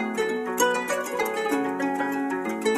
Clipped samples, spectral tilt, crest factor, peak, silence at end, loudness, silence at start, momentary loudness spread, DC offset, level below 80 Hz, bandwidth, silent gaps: under 0.1%; -3 dB/octave; 16 dB; -10 dBFS; 0 s; -26 LUFS; 0 s; 4 LU; under 0.1%; -66 dBFS; 15 kHz; none